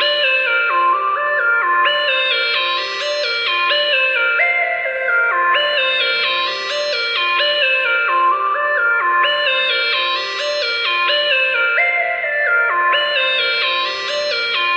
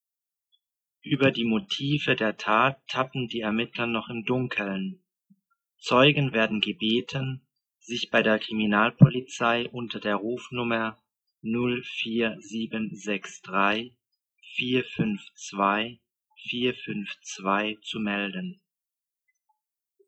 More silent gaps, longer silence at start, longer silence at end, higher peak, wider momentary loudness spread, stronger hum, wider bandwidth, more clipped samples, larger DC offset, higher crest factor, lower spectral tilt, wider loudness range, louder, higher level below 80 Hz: neither; second, 0 s vs 1.05 s; second, 0 s vs 1.55 s; about the same, -4 dBFS vs -2 dBFS; second, 4 LU vs 12 LU; neither; about the same, 9 kHz vs 8.4 kHz; neither; neither; second, 14 dB vs 26 dB; second, 0 dB/octave vs -5.5 dB/octave; second, 1 LU vs 6 LU; first, -15 LUFS vs -26 LUFS; about the same, -64 dBFS vs -64 dBFS